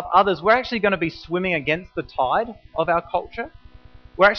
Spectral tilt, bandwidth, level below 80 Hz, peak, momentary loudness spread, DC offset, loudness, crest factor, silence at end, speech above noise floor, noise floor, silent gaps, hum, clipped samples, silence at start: -3 dB/octave; 6.4 kHz; -48 dBFS; -2 dBFS; 13 LU; under 0.1%; -22 LUFS; 18 dB; 0 s; 23 dB; -45 dBFS; none; none; under 0.1%; 0 s